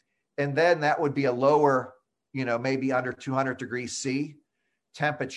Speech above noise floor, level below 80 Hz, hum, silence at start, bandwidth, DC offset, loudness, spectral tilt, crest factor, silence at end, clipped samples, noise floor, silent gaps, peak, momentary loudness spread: 54 dB; -70 dBFS; none; 0.4 s; 11.5 kHz; under 0.1%; -26 LUFS; -5.5 dB/octave; 18 dB; 0 s; under 0.1%; -80 dBFS; none; -8 dBFS; 11 LU